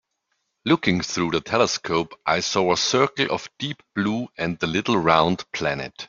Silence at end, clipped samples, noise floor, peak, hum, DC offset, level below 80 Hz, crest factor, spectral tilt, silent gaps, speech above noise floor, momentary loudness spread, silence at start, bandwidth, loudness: 0.05 s; under 0.1%; -75 dBFS; -2 dBFS; none; under 0.1%; -56 dBFS; 22 dB; -4 dB/octave; none; 52 dB; 8 LU; 0.65 s; 7.6 kHz; -22 LUFS